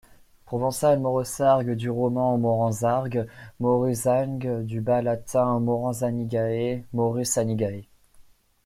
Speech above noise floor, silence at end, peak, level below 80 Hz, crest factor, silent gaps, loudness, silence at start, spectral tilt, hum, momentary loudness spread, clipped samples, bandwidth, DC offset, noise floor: 30 dB; 0.45 s; -8 dBFS; -56 dBFS; 16 dB; none; -25 LUFS; 0.45 s; -6.5 dB/octave; none; 7 LU; under 0.1%; 16 kHz; under 0.1%; -54 dBFS